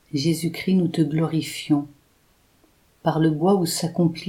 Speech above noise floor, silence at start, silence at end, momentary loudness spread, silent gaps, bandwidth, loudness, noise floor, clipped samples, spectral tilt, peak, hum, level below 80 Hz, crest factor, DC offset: 39 dB; 0.15 s; 0 s; 5 LU; none; 16.5 kHz; -22 LUFS; -61 dBFS; under 0.1%; -6 dB/octave; -6 dBFS; none; -62 dBFS; 16 dB; under 0.1%